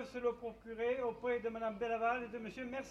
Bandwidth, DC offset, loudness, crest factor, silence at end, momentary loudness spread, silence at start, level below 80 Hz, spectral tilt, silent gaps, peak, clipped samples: 8.2 kHz; under 0.1%; -39 LUFS; 16 dB; 0 s; 9 LU; 0 s; -66 dBFS; -5.5 dB/octave; none; -22 dBFS; under 0.1%